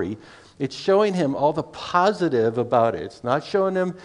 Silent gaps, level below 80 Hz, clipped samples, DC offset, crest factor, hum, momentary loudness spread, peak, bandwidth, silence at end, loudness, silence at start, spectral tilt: none; -60 dBFS; under 0.1%; under 0.1%; 18 dB; none; 10 LU; -4 dBFS; 10.5 kHz; 0 s; -22 LUFS; 0 s; -6.5 dB/octave